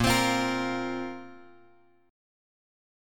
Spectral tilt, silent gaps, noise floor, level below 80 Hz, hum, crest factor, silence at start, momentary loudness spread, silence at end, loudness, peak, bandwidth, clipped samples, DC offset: -4 dB/octave; none; -61 dBFS; -50 dBFS; none; 20 dB; 0 s; 20 LU; 1 s; -28 LUFS; -10 dBFS; 17.5 kHz; under 0.1%; under 0.1%